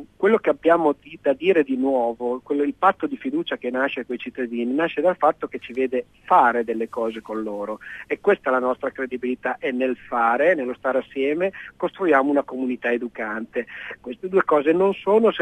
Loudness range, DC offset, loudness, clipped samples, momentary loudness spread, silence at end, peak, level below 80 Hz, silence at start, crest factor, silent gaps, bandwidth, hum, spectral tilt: 2 LU; under 0.1%; -22 LUFS; under 0.1%; 11 LU; 0 s; -4 dBFS; -62 dBFS; 0 s; 18 dB; none; 9.6 kHz; none; -7 dB/octave